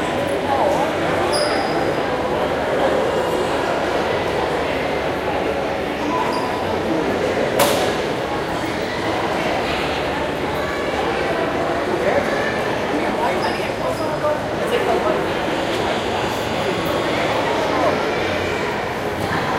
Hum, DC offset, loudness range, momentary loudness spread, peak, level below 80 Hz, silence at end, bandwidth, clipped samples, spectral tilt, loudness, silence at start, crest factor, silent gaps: none; under 0.1%; 1 LU; 4 LU; -2 dBFS; -42 dBFS; 0 s; 16 kHz; under 0.1%; -4.5 dB/octave; -20 LUFS; 0 s; 18 dB; none